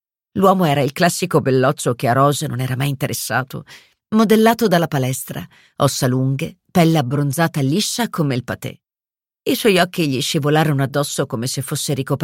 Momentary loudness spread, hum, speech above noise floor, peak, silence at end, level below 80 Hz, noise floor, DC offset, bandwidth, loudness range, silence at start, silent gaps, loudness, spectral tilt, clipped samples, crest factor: 10 LU; none; over 73 dB; -2 dBFS; 0 s; -56 dBFS; under -90 dBFS; under 0.1%; 17 kHz; 2 LU; 0.35 s; none; -18 LUFS; -5 dB/octave; under 0.1%; 16 dB